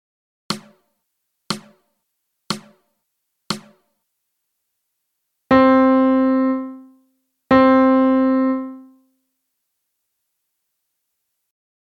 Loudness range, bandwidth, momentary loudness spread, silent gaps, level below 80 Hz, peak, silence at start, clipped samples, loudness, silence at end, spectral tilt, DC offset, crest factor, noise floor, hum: 18 LU; 12 kHz; 16 LU; none; -54 dBFS; -2 dBFS; 0.5 s; under 0.1%; -17 LUFS; 3.2 s; -5.5 dB/octave; under 0.1%; 18 dB; -75 dBFS; none